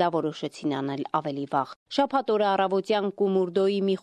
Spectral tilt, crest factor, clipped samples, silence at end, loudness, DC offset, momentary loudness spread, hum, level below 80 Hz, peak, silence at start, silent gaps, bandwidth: -6.5 dB/octave; 16 dB; under 0.1%; 0.05 s; -26 LUFS; under 0.1%; 6 LU; none; -72 dBFS; -10 dBFS; 0 s; 1.76-1.86 s; 10 kHz